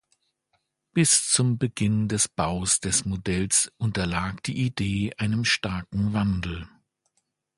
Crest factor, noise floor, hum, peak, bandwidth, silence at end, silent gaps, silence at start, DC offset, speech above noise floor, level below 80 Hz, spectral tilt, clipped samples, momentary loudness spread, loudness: 22 dB; -75 dBFS; none; -4 dBFS; 11.5 kHz; 0.9 s; none; 0.95 s; under 0.1%; 50 dB; -46 dBFS; -3.5 dB/octave; under 0.1%; 9 LU; -24 LUFS